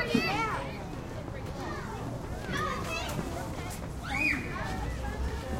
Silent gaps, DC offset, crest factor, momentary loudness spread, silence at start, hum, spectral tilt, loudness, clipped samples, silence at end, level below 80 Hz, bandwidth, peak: none; under 0.1%; 22 dB; 11 LU; 0 s; none; -5 dB/octave; -34 LUFS; under 0.1%; 0 s; -42 dBFS; 16 kHz; -12 dBFS